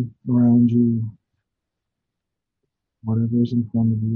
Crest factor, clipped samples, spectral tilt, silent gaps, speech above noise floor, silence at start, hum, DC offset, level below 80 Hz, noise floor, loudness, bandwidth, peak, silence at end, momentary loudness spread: 14 dB; under 0.1%; -12 dB/octave; none; 64 dB; 0 s; none; under 0.1%; -58 dBFS; -83 dBFS; -19 LUFS; 4.3 kHz; -6 dBFS; 0 s; 11 LU